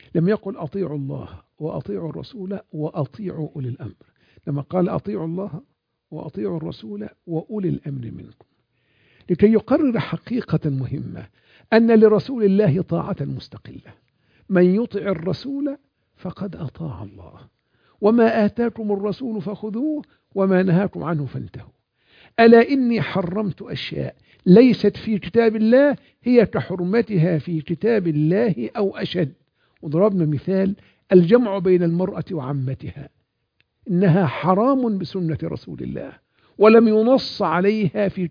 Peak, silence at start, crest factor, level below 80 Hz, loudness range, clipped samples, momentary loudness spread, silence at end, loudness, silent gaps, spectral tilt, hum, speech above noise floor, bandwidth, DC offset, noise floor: 0 dBFS; 0.15 s; 20 dB; -56 dBFS; 10 LU; under 0.1%; 18 LU; 0 s; -20 LUFS; none; -9.5 dB/octave; none; 49 dB; 5.2 kHz; under 0.1%; -68 dBFS